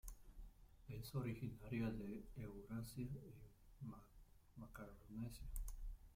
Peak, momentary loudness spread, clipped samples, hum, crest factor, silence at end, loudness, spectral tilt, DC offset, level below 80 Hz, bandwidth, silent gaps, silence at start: -32 dBFS; 18 LU; under 0.1%; none; 18 dB; 0 s; -52 LUFS; -6.5 dB/octave; under 0.1%; -58 dBFS; 16.5 kHz; none; 0.05 s